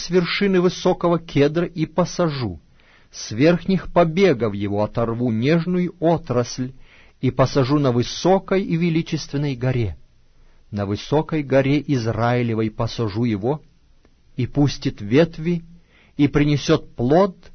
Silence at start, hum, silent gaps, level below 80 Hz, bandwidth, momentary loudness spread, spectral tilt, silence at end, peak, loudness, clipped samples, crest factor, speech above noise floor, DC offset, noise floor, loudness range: 0 s; none; none; -42 dBFS; 6.6 kHz; 10 LU; -6.5 dB/octave; 0.05 s; -4 dBFS; -20 LUFS; under 0.1%; 16 dB; 34 dB; under 0.1%; -53 dBFS; 3 LU